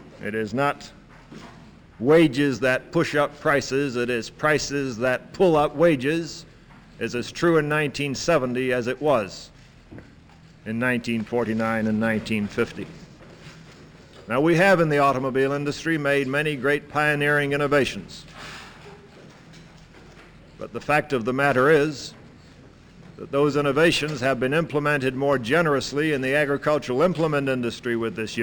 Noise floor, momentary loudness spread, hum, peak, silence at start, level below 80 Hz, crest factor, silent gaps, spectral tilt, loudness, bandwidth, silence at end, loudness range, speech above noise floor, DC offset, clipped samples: -49 dBFS; 16 LU; none; -6 dBFS; 0 s; -52 dBFS; 18 dB; none; -5.5 dB/octave; -22 LUFS; over 20 kHz; 0 s; 5 LU; 27 dB; under 0.1%; under 0.1%